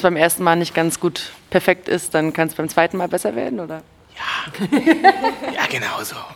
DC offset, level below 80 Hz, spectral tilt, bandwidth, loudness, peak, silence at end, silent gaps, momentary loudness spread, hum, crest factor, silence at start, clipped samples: under 0.1%; -56 dBFS; -4 dB/octave; 18 kHz; -19 LUFS; 0 dBFS; 0 s; none; 11 LU; none; 18 dB; 0 s; under 0.1%